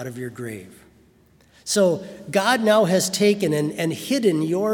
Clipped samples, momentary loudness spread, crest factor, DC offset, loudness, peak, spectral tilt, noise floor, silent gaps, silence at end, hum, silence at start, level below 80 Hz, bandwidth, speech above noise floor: under 0.1%; 16 LU; 18 dB; under 0.1%; -20 LUFS; -4 dBFS; -4.5 dB/octave; -56 dBFS; none; 0 s; none; 0 s; -64 dBFS; 18 kHz; 35 dB